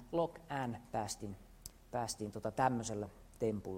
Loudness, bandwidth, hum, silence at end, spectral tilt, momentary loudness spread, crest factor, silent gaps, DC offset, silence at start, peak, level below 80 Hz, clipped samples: -40 LUFS; 16 kHz; none; 0 s; -5 dB/octave; 14 LU; 22 dB; none; under 0.1%; 0 s; -18 dBFS; -62 dBFS; under 0.1%